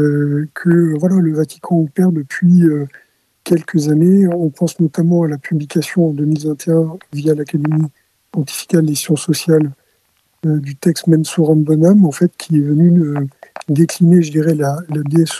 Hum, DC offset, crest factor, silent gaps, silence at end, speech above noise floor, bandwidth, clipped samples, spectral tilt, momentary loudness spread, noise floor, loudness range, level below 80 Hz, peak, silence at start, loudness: none; under 0.1%; 14 dB; none; 0 s; 47 dB; 13.5 kHz; under 0.1%; -7 dB/octave; 10 LU; -60 dBFS; 4 LU; -64 dBFS; 0 dBFS; 0 s; -14 LUFS